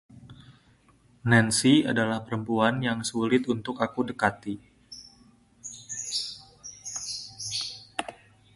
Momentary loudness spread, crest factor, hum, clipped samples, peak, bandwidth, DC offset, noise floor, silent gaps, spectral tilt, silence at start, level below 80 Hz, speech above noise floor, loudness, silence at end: 21 LU; 22 dB; none; under 0.1%; -6 dBFS; 11.5 kHz; under 0.1%; -60 dBFS; none; -4 dB/octave; 0.1 s; -62 dBFS; 36 dB; -27 LUFS; 0.4 s